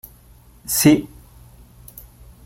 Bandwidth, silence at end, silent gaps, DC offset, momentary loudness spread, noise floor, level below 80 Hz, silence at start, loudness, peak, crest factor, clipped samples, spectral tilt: 17 kHz; 1.4 s; none; under 0.1%; 26 LU; -48 dBFS; -46 dBFS; 0.7 s; -17 LUFS; -2 dBFS; 20 dB; under 0.1%; -4.5 dB/octave